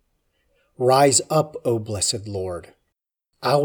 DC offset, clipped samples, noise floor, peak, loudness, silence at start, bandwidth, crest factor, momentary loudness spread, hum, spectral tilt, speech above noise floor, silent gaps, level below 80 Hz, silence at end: under 0.1%; under 0.1%; -79 dBFS; -2 dBFS; -21 LUFS; 0.8 s; over 20 kHz; 20 dB; 14 LU; none; -4 dB/octave; 58 dB; none; -58 dBFS; 0 s